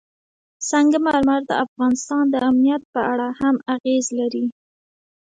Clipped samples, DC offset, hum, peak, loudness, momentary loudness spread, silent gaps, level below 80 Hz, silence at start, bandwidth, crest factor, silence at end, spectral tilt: under 0.1%; under 0.1%; none; -6 dBFS; -20 LUFS; 6 LU; 1.68-1.76 s, 2.85-2.93 s, 3.80-3.84 s; -58 dBFS; 0.6 s; 9.4 kHz; 14 dB; 0.9 s; -3.5 dB/octave